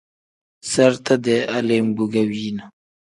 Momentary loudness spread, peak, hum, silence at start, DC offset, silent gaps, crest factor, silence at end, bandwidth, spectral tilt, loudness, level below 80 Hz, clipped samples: 12 LU; 0 dBFS; none; 0.65 s; under 0.1%; none; 20 dB; 0.45 s; 11.5 kHz; -5 dB/octave; -19 LUFS; -62 dBFS; under 0.1%